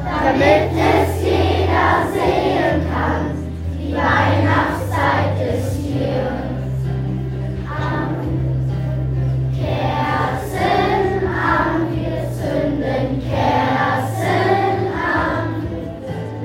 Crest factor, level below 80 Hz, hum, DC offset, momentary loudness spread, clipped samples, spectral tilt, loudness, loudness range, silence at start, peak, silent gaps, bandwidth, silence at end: 18 dB; -34 dBFS; none; under 0.1%; 8 LU; under 0.1%; -7 dB/octave; -18 LUFS; 4 LU; 0 s; 0 dBFS; none; 16 kHz; 0 s